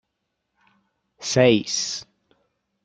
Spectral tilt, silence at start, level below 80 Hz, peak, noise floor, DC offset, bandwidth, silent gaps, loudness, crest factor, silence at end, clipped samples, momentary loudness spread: -4 dB/octave; 1.2 s; -62 dBFS; -2 dBFS; -78 dBFS; under 0.1%; 9.4 kHz; none; -21 LUFS; 22 dB; 0.8 s; under 0.1%; 16 LU